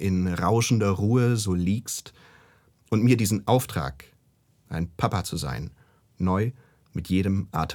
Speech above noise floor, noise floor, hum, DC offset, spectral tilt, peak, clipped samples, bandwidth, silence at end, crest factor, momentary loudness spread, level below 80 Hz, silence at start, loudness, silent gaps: 40 dB; -64 dBFS; none; under 0.1%; -6 dB/octave; -6 dBFS; under 0.1%; 19.5 kHz; 0 s; 18 dB; 12 LU; -50 dBFS; 0 s; -25 LUFS; none